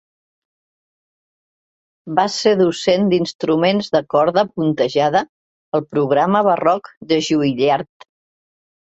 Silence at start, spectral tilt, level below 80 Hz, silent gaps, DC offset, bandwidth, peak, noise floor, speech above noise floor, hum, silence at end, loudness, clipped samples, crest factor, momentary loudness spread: 2.05 s; -5.5 dB/octave; -60 dBFS; 3.35-3.39 s, 5.29-5.72 s, 6.97-7.01 s; under 0.1%; 8.2 kHz; -2 dBFS; under -90 dBFS; over 74 dB; none; 0.95 s; -17 LUFS; under 0.1%; 16 dB; 7 LU